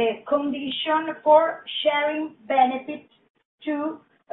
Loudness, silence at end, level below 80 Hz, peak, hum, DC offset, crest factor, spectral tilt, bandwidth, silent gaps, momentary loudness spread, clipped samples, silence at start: -23 LUFS; 0.35 s; -70 dBFS; -4 dBFS; none; under 0.1%; 20 dB; -7.5 dB/octave; 4.1 kHz; 3.30-3.34 s, 3.45-3.58 s; 15 LU; under 0.1%; 0 s